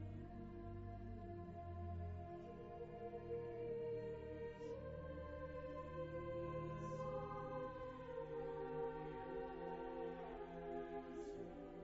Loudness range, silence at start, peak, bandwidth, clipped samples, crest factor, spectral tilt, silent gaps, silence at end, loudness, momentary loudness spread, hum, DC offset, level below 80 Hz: 2 LU; 0 s; -36 dBFS; 7.6 kHz; under 0.1%; 12 dB; -7 dB/octave; none; 0 s; -50 LUFS; 6 LU; none; under 0.1%; -62 dBFS